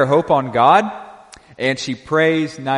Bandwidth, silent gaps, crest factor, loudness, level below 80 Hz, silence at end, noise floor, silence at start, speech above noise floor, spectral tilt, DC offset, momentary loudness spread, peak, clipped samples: 11 kHz; none; 16 dB; -16 LUFS; -56 dBFS; 0 s; -42 dBFS; 0 s; 26 dB; -5.5 dB/octave; under 0.1%; 11 LU; 0 dBFS; under 0.1%